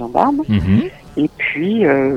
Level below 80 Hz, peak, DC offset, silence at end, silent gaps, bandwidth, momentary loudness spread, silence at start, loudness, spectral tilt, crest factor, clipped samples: -38 dBFS; 0 dBFS; under 0.1%; 0 s; none; 8 kHz; 7 LU; 0 s; -16 LUFS; -8.5 dB/octave; 16 dB; under 0.1%